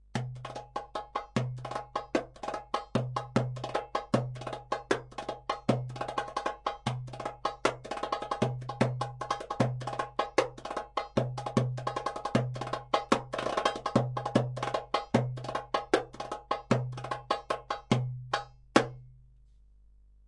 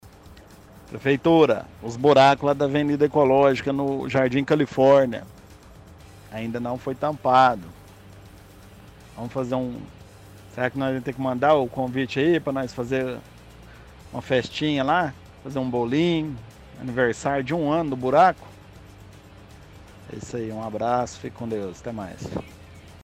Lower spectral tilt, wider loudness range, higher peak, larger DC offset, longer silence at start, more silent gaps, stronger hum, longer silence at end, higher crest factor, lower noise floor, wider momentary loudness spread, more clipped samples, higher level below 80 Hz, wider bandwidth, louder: about the same, -6 dB/octave vs -6.5 dB/octave; second, 3 LU vs 11 LU; about the same, -6 dBFS vs -4 dBFS; neither; about the same, 0.15 s vs 0.05 s; neither; neither; first, 1.05 s vs 0.05 s; first, 28 dB vs 20 dB; first, -58 dBFS vs -47 dBFS; second, 8 LU vs 18 LU; neither; second, -58 dBFS vs -52 dBFS; second, 11.5 kHz vs 15.5 kHz; second, -33 LUFS vs -22 LUFS